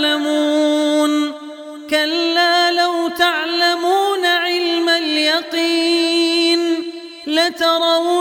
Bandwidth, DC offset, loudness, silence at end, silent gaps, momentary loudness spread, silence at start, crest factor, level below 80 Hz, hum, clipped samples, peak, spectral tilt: 17 kHz; under 0.1%; -16 LUFS; 0 s; none; 6 LU; 0 s; 16 dB; -66 dBFS; none; under 0.1%; 0 dBFS; -0.5 dB/octave